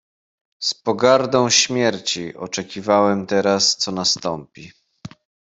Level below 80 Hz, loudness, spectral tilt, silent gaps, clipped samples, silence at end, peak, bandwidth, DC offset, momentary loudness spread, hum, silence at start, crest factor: -62 dBFS; -18 LUFS; -3 dB/octave; none; under 0.1%; 0.5 s; 0 dBFS; 8.4 kHz; under 0.1%; 12 LU; none; 0.6 s; 20 dB